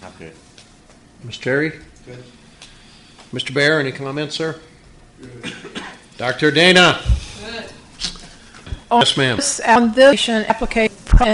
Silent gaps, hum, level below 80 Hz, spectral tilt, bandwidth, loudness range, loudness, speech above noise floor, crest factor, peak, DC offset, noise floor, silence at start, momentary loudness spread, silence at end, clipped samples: none; none; -28 dBFS; -4 dB/octave; 11.5 kHz; 7 LU; -16 LUFS; 30 dB; 18 dB; 0 dBFS; under 0.1%; -47 dBFS; 0.05 s; 21 LU; 0 s; under 0.1%